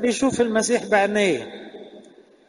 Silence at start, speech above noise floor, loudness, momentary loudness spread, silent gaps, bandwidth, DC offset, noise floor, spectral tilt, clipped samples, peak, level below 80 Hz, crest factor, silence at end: 0 s; 29 dB; -20 LUFS; 20 LU; none; 11.5 kHz; under 0.1%; -49 dBFS; -3.5 dB/octave; under 0.1%; -4 dBFS; -58 dBFS; 18 dB; 0.45 s